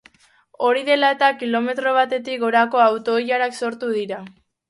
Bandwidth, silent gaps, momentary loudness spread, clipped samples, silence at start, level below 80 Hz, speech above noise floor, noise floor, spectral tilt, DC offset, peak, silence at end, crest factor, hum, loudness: 11.5 kHz; none; 8 LU; under 0.1%; 0.6 s; -72 dBFS; 36 dB; -55 dBFS; -4 dB/octave; under 0.1%; -4 dBFS; 0.4 s; 16 dB; none; -19 LUFS